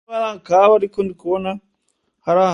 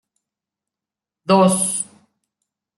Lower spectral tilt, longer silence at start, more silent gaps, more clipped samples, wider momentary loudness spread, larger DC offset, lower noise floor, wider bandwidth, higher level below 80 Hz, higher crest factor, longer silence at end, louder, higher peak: first, -6 dB/octave vs -4.5 dB/octave; second, 0.1 s vs 1.3 s; neither; neither; about the same, 15 LU vs 17 LU; neither; second, -69 dBFS vs -88 dBFS; second, 10 kHz vs 12 kHz; first, -60 dBFS vs -66 dBFS; about the same, 18 dB vs 20 dB; second, 0 s vs 0.95 s; about the same, -18 LUFS vs -17 LUFS; about the same, 0 dBFS vs -2 dBFS